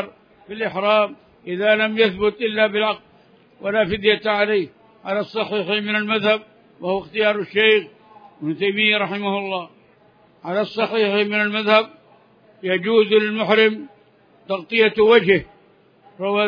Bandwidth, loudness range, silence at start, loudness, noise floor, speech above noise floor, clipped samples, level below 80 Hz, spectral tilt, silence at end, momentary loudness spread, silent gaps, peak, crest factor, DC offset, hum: 5.2 kHz; 3 LU; 0 s; -19 LUFS; -54 dBFS; 35 dB; under 0.1%; -58 dBFS; -7 dB/octave; 0 s; 15 LU; none; 0 dBFS; 20 dB; under 0.1%; none